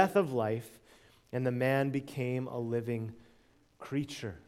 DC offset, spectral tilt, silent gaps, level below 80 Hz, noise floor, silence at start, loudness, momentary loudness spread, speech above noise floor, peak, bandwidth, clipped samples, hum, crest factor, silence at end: under 0.1%; -7 dB/octave; none; -68 dBFS; -66 dBFS; 0 s; -34 LUFS; 11 LU; 33 dB; -10 dBFS; 15.5 kHz; under 0.1%; none; 24 dB; 0.1 s